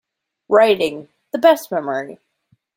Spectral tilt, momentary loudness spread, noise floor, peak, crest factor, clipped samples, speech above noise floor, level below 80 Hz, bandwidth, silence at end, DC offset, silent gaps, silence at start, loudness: -4.5 dB/octave; 16 LU; -63 dBFS; -2 dBFS; 18 dB; under 0.1%; 47 dB; -68 dBFS; 16.5 kHz; 0.6 s; under 0.1%; none; 0.5 s; -17 LUFS